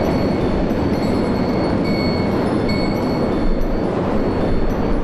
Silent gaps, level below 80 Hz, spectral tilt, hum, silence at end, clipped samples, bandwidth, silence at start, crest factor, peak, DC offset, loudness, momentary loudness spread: none; -26 dBFS; -7.5 dB/octave; none; 0 s; under 0.1%; 12.5 kHz; 0 s; 10 dB; -6 dBFS; 0.5%; -19 LUFS; 2 LU